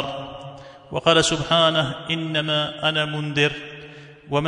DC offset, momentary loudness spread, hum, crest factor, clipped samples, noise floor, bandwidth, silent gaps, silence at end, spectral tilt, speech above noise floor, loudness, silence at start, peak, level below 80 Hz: under 0.1%; 20 LU; none; 20 dB; under 0.1%; -42 dBFS; 11 kHz; none; 0 s; -4 dB/octave; 21 dB; -21 LUFS; 0 s; -2 dBFS; -52 dBFS